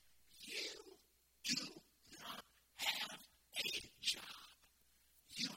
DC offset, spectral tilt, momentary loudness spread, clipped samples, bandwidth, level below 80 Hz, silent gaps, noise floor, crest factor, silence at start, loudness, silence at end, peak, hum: under 0.1%; -0.5 dB/octave; 19 LU; under 0.1%; 16.5 kHz; -80 dBFS; none; -73 dBFS; 24 dB; 0.05 s; -44 LUFS; 0 s; -26 dBFS; none